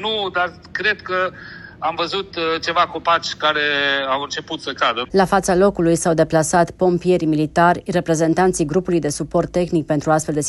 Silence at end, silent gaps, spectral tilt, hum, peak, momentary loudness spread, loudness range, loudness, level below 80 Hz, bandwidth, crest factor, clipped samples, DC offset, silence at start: 0 s; none; -4.5 dB/octave; none; -2 dBFS; 7 LU; 3 LU; -18 LUFS; -46 dBFS; 12.5 kHz; 16 dB; under 0.1%; under 0.1%; 0 s